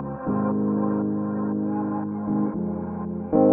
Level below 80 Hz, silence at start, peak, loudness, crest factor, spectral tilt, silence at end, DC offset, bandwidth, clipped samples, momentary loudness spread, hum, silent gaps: -58 dBFS; 0 s; -8 dBFS; -26 LUFS; 16 dB; -13.5 dB/octave; 0 s; under 0.1%; 2.5 kHz; under 0.1%; 5 LU; none; none